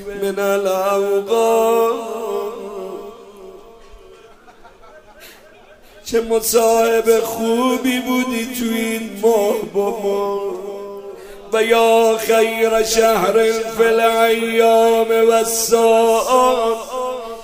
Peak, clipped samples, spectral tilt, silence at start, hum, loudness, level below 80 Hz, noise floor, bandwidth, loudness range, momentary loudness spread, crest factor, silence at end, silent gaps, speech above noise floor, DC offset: 0 dBFS; under 0.1%; -3 dB/octave; 0 s; none; -16 LUFS; -50 dBFS; -44 dBFS; 16 kHz; 10 LU; 13 LU; 16 dB; 0 s; none; 29 dB; under 0.1%